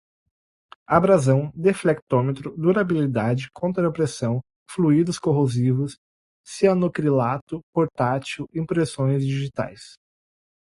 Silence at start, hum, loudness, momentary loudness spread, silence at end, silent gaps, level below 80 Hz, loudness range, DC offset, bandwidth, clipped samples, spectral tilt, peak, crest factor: 0.9 s; none; -22 LUFS; 10 LU; 0.75 s; 2.02-2.07 s, 4.56-4.66 s, 5.98-6.44 s, 7.42-7.47 s, 7.63-7.73 s; -56 dBFS; 3 LU; under 0.1%; 11.5 kHz; under 0.1%; -7 dB/octave; -4 dBFS; 20 dB